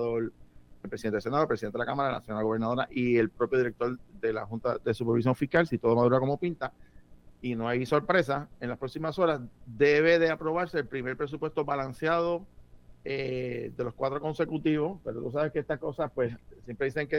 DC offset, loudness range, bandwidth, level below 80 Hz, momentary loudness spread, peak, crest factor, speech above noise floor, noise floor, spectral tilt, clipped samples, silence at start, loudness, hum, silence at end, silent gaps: under 0.1%; 5 LU; 12 kHz; -56 dBFS; 11 LU; -10 dBFS; 18 dB; 24 dB; -52 dBFS; -7.5 dB/octave; under 0.1%; 0 s; -29 LUFS; none; 0 s; none